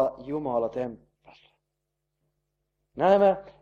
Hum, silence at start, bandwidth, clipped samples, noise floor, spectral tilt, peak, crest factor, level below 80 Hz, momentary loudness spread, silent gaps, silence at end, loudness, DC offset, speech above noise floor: none; 0 s; 6.8 kHz; under 0.1%; -82 dBFS; -8 dB/octave; -8 dBFS; 20 dB; -64 dBFS; 15 LU; none; 0.1 s; -25 LUFS; under 0.1%; 57 dB